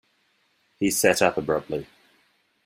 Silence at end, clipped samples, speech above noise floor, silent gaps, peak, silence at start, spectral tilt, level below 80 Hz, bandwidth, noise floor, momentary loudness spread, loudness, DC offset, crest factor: 0.8 s; under 0.1%; 45 dB; none; -4 dBFS; 0.8 s; -3.5 dB/octave; -60 dBFS; 16 kHz; -67 dBFS; 13 LU; -23 LUFS; under 0.1%; 22 dB